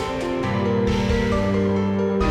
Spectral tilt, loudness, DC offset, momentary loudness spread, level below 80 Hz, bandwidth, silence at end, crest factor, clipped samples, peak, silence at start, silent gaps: -7 dB/octave; -21 LUFS; under 0.1%; 3 LU; -32 dBFS; 10.5 kHz; 0 s; 12 dB; under 0.1%; -8 dBFS; 0 s; none